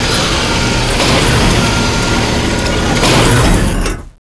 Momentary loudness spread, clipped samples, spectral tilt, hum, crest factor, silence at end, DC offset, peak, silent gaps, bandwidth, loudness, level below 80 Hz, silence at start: 5 LU; under 0.1%; -4 dB/octave; none; 12 dB; 0.25 s; under 0.1%; 0 dBFS; none; 11 kHz; -11 LUFS; -18 dBFS; 0 s